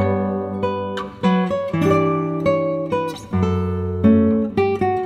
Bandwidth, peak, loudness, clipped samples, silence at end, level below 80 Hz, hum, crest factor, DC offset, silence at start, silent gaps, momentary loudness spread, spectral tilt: 11 kHz; -2 dBFS; -20 LUFS; under 0.1%; 0 s; -46 dBFS; none; 16 dB; under 0.1%; 0 s; none; 7 LU; -8 dB/octave